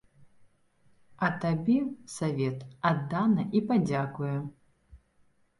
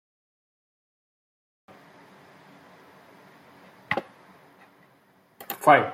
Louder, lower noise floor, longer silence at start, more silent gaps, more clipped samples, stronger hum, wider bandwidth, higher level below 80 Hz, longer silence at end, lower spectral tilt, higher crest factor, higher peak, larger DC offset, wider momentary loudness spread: second, -29 LUFS vs -24 LUFS; first, -66 dBFS vs -61 dBFS; second, 0.2 s vs 3.9 s; neither; neither; neither; second, 11.5 kHz vs 16.5 kHz; first, -64 dBFS vs -76 dBFS; first, 0.65 s vs 0 s; first, -7 dB/octave vs -5 dB/octave; second, 18 dB vs 28 dB; second, -12 dBFS vs -2 dBFS; neither; second, 7 LU vs 30 LU